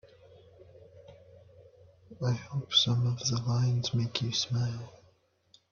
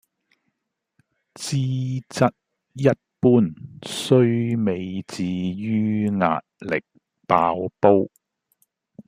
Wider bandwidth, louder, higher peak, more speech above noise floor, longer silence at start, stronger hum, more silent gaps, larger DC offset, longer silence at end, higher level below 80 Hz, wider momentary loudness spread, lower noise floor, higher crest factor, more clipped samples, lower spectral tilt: second, 7.2 kHz vs 15 kHz; second, -29 LUFS vs -22 LUFS; second, -10 dBFS vs -2 dBFS; second, 37 dB vs 59 dB; second, 0.6 s vs 1.4 s; neither; neither; neither; first, 0.75 s vs 0.05 s; about the same, -64 dBFS vs -62 dBFS; about the same, 10 LU vs 11 LU; second, -67 dBFS vs -80 dBFS; about the same, 22 dB vs 22 dB; neither; second, -4.5 dB/octave vs -6.5 dB/octave